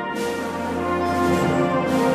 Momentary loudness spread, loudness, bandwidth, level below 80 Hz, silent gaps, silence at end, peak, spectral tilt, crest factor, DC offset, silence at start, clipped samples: 6 LU; -22 LUFS; 15.5 kHz; -48 dBFS; none; 0 s; -8 dBFS; -6 dB/octave; 12 dB; under 0.1%; 0 s; under 0.1%